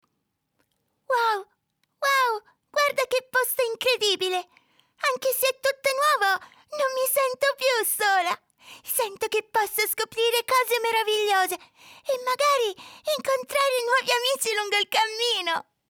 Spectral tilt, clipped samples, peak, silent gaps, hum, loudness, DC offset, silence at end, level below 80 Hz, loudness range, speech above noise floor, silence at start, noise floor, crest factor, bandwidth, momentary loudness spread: 0.5 dB/octave; under 0.1%; -10 dBFS; none; none; -24 LUFS; under 0.1%; 0.3 s; -76 dBFS; 1 LU; 53 dB; 1.1 s; -77 dBFS; 16 dB; over 20 kHz; 7 LU